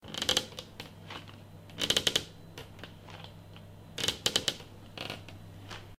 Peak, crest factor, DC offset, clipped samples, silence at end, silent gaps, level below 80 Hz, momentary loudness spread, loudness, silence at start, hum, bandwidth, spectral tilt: -6 dBFS; 30 dB; under 0.1%; under 0.1%; 0.05 s; none; -60 dBFS; 21 LU; -31 LUFS; 0 s; none; 16 kHz; -1.5 dB/octave